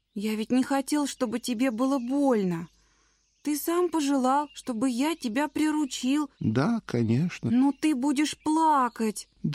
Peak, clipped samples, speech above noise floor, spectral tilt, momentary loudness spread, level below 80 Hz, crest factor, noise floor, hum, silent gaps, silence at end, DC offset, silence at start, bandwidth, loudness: -12 dBFS; under 0.1%; 41 dB; -5.5 dB/octave; 7 LU; -66 dBFS; 14 dB; -67 dBFS; none; none; 0 s; under 0.1%; 0.15 s; 15.5 kHz; -27 LUFS